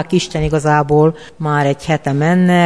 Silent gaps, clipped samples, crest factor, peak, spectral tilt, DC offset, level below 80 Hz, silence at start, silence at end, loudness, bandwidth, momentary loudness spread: none; under 0.1%; 14 dB; 0 dBFS; -6.5 dB/octave; 0.6%; -36 dBFS; 0 s; 0 s; -15 LUFS; 11 kHz; 6 LU